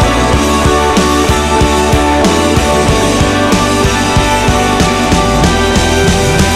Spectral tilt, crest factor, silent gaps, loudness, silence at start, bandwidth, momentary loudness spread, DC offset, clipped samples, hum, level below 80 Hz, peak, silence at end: -4.5 dB/octave; 10 dB; none; -10 LUFS; 0 s; 16 kHz; 1 LU; under 0.1%; under 0.1%; none; -18 dBFS; 0 dBFS; 0 s